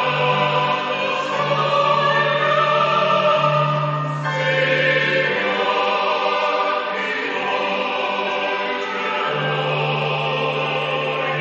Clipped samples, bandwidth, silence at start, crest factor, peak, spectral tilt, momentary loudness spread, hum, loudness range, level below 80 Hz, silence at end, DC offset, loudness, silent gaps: under 0.1%; 8 kHz; 0 s; 14 dB; -4 dBFS; -2 dB/octave; 5 LU; none; 3 LU; -68 dBFS; 0 s; under 0.1%; -19 LUFS; none